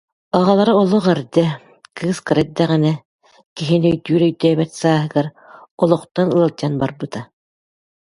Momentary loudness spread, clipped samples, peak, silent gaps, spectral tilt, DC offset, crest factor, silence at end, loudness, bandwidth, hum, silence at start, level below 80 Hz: 14 LU; under 0.1%; 0 dBFS; 3.05-3.19 s, 3.46-3.56 s, 5.71-5.78 s, 6.11-6.15 s; -7 dB/octave; under 0.1%; 18 dB; 0.75 s; -17 LUFS; 11.5 kHz; none; 0.35 s; -56 dBFS